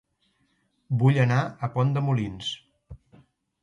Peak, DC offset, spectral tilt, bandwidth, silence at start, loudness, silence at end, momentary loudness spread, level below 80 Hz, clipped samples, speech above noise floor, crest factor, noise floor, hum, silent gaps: -8 dBFS; under 0.1%; -7 dB/octave; 7.6 kHz; 0.9 s; -25 LUFS; 0.65 s; 12 LU; -56 dBFS; under 0.1%; 46 dB; 18 dB; -70 dBFS; none; none